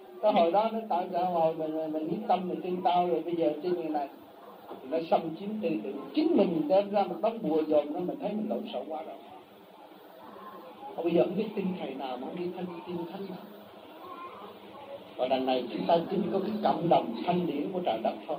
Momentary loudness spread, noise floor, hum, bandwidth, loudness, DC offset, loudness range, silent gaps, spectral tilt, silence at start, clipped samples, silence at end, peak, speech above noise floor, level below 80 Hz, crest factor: 20 LU; -52 dBFS; none; 16 kHz; -30 LUFS; under 0.1%; 8 LU; none; -8.5 dB/octave; 0 s; under 0.1%; 0 s; -12 dBFS; 23 dB; -80 dBFS; 18 dB